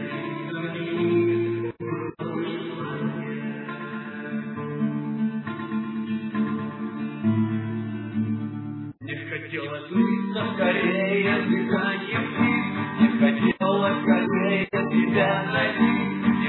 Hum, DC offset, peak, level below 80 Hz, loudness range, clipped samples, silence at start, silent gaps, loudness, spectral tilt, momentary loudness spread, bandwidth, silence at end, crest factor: none; under 0.1%; -6 dBFS; -66 dBFS; 8 LU; under 0.1%; 0 s; none; -25 LUFS; -10.5 dB/octave; 10 LU; 4.2 kHz; 0 s; 18 dB